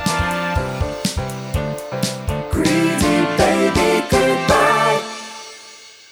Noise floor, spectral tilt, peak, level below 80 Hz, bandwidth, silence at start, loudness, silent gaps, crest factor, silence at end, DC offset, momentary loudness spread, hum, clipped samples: -41 dBFS; -4.5 dB/octave; 0 dBFS; -34 dBFS; over 20 kHz; 0 s; -18 LUFS; none; 18 dB; 0.2 s; under 0.1%; 15 LU; none; under 0.1%